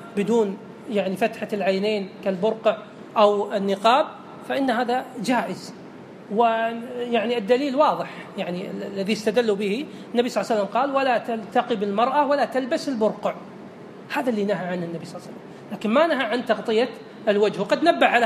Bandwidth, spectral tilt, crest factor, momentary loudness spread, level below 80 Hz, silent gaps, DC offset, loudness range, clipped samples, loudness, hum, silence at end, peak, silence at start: 14.5 kHz; -5.5 dB/octave; 20 dB; 14 LU; -76 dBFS; none; under 0.1%; 3 LU; under 0.1%; -23 LUFS; none; 0 s; -4 dBFS; 0 s